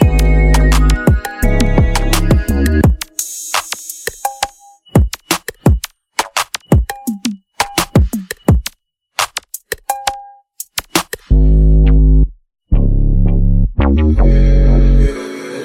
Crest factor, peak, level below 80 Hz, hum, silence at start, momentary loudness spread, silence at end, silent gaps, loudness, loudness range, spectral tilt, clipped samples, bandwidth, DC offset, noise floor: 12 dB; 0 dBFS; -14 dBFS; none; 0 s; 11 LU; 0 s; none; -15 LUFS; 5 LU; -5.5 dB/octave; under 0.1%; 16.5 kHz; under 0.1%; -51 dBFS